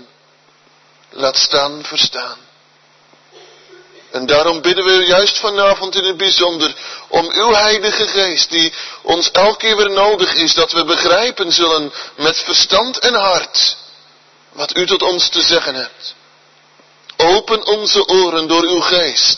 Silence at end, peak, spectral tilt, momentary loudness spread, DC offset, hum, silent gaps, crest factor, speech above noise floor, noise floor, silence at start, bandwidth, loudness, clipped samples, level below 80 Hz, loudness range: 0 s; 0 dBFS; -1.5 dB/octave; 9 LU; 0.2%; none; none; 14 dB; 37 dB; -51 dBFS; 1.15 s; 6.4 kHz; -12 LUFS; under 0.1%; -50 dBFS; 6 LU